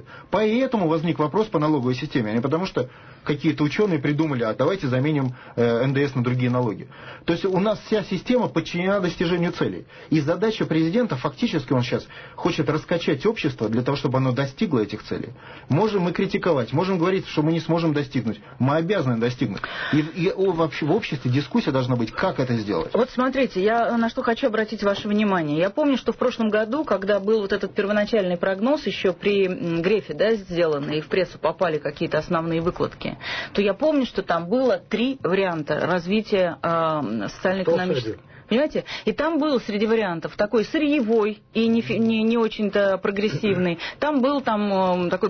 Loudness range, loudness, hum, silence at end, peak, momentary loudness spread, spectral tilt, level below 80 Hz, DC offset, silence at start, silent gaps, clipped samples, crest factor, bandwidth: 2 LU; -23 LUFS; none; 0 s; -10 dBFS; 5 LU; -7 dB/octave; -52 dBFS; under 0.1%; 0 s; none; under 0.1%; 12 dB; 6.6 kHz